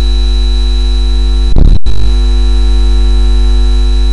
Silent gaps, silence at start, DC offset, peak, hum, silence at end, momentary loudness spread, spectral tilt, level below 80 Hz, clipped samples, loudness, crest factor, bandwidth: none; 0 s; under 0.1%; 0 dBFS; 50 Hz at -10 dBFS; 0 s; 2 LU; -6 dB/octave; -8 dBFS; 0.2%; -11 LUFS; 6 dB; 9.8 kHz